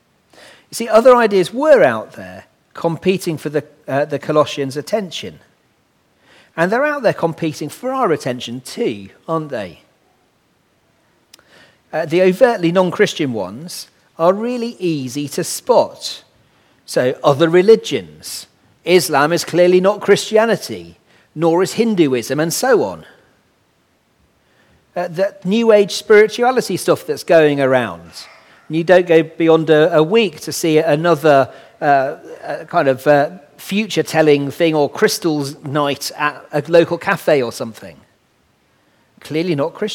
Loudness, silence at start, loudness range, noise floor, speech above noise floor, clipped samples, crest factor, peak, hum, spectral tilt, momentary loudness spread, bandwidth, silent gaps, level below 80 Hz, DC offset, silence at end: -15 LUFS; 0.7 s; 7 LU; -59 dBFS; 44 dB; under 0.1%; 16 dB; 0 dBFS; none; -5 dB/octave; 16 LU; 17.5 kHz; none; -62 dBFS; under 0.1%; 0 s